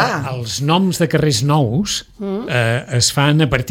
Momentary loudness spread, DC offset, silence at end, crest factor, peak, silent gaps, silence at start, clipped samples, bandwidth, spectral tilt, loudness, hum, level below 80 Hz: 8 LU; under 0.1%; 0 s; 16 dB; -2 dBFS; none; 0 s; under 0.1%; 16.5 kHz; -4.5 dB/octave; -16 LUFS; none; -42 dBFS